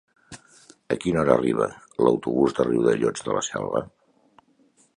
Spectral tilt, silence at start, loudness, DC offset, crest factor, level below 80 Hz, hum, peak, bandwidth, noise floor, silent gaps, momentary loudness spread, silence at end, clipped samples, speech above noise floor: -5.5 dB/octave; 0.3 s; -23 LUFS; under 0.1%; 22 dB; -54 dBFS; none; -2 dBFS; 11 kHz; -61 dBFS; none; 9 LU; 1.1 s; under 0.1%; 39 dB